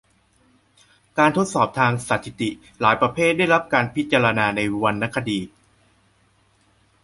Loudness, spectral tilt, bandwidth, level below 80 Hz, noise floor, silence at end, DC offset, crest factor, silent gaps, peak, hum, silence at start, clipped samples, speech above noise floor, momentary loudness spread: -20 LUFS; -5 dB/octave; 11.5 kHz; -56 dBFS; -61 dBFS; 1.55 s; under 0.1%; 20 dB; none; -2 dBFS; none; 1.15 s; under 0.1%; 40 dB; 10 LU